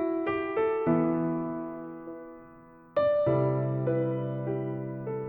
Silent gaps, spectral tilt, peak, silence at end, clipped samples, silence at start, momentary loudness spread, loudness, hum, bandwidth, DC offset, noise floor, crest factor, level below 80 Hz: none; -12 dB/octave; -14 dBFS; 0 s; under 0.1%; 0 s; 16 LU; -29 LUFS; none; 4.5 kHz; under 0.1%; -52 dBFS; 16 dB; -62 dBFS